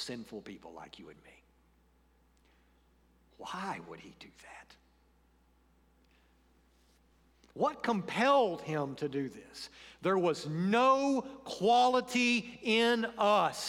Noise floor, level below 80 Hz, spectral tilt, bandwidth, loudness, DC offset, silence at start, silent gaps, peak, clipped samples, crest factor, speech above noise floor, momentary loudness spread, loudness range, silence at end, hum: -68 dBFS; -70 dBFS; -4.5 dB/octave; 16 kHz; -31 LUFS; under 0.1%; 0 s; none; -16 dBFS; under 0.1%; 18 dB; 36 dB; 23 LU; 19 LU; 0 s; none